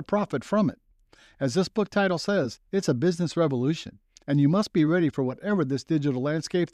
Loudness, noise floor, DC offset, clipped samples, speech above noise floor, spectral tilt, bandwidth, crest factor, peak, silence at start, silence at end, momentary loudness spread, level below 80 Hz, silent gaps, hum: -26 LUFS; -58 dBFS; under 0.1%; under 0.1%; 33 dB; -6.5 dB/octave; 12.5 kHz; 14 dB; -10 dBFS; 0 s; 0.1 s; 6 LU; -62 dBFS; none; none